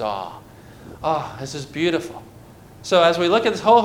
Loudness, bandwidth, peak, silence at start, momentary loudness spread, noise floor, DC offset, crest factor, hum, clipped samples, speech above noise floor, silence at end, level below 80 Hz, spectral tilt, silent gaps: -20 LUFS; 16.5 kHz; -4 dBFS; 0 s; 21 LU; -44 dBFS; under 0.1%; 18 dB; none; under 0.1%; 24 dB; 0 s; -52 dBFS; -4.5 dB/octave; none